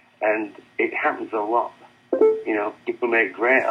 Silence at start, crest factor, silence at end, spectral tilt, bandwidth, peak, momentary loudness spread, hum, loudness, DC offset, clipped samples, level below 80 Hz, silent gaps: 0.2 s; 18 dB; 0 s; -6 dB/octave; 6.2 kHz; -6 dBFS; 9 LU; none; -22 LUFS; under 0.1%; under 0.1%; -76 dBFS; none